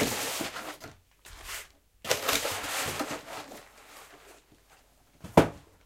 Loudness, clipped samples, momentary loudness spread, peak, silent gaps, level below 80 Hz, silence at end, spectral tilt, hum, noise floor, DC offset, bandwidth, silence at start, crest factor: -30 LUFS; under 0.1%; 25 LU; -2 dBFS; none; -54 dBFS; 0.25 s; -3.5 dB/octave; none; -61 dBFS; under 0.1%; 16.5 kHz; 0 s; 30 dB